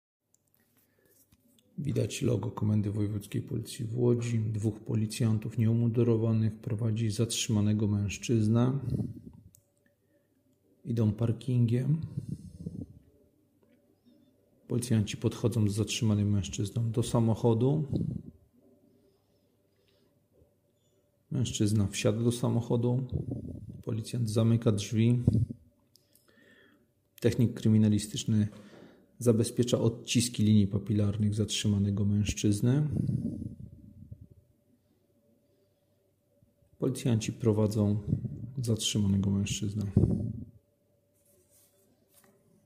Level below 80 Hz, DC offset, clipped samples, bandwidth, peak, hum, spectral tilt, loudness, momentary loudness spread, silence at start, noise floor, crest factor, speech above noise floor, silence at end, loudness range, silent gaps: -54 dBFS; under 0.1%; under 0.1%; 15.5 kHz; -10 dBFS; none; -6.5 dB/octave; -30 LUFS; 12 LU; 1.8 s; -71 dBFS; 20 dB; 43 dB; 2.15 s; 7 LU; none